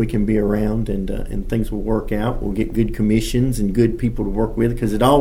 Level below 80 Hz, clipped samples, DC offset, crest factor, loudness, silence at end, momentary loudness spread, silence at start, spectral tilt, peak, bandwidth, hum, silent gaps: -26 dBFS; under 0.1%; under 0.1%; 16 dB; -20 LUFS; 0 s; 5 LU; 0 s; -7 dB/octave; -2 dBFS; 16.5 kHz; none; none